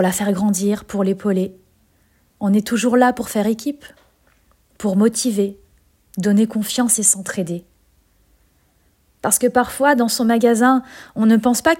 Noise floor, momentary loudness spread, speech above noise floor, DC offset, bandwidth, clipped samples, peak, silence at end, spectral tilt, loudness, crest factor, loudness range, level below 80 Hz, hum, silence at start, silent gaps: -59 dBFS; 11 LU; 42 dB; under 0.1%; 16.5 kHz; under 0.1%; 0 dBFS; 0 s; -4 dB/octave; -18 LUFS; 18 dB; 3 LU; -56 dBFS; none; 0 s; none